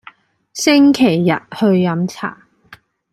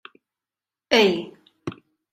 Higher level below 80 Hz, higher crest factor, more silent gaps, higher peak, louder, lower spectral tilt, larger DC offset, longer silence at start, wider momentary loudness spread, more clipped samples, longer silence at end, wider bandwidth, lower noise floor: about the same, -60 dBFS vs -64 dBFS; second, 14 dB vs 22 dB; neither; about the same, -2 dBFS vs -2 dBFS; first, -14 LUFS vs -20 LUFS; first, -5.5 dB/octave vs -4 dB/octave; neither; second, 0.55 s vs 0.9 s; second, 16 LU vs 19 LU; neither; first, 0.8 s vs 0.4 s; second, 14 kHz vs 15.5 kHz; second, -45 dBFS vs under -90 dBFS